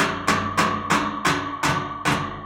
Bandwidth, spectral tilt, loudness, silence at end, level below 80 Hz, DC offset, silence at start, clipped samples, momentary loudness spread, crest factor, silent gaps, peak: 16.5 kHz; -4 dB/octave; -22 LUFS; 0 s; -48 dBFS; under 0.1%; 0 s; under 0.1%; 3 LU; 18 dB; none; -6 dBFS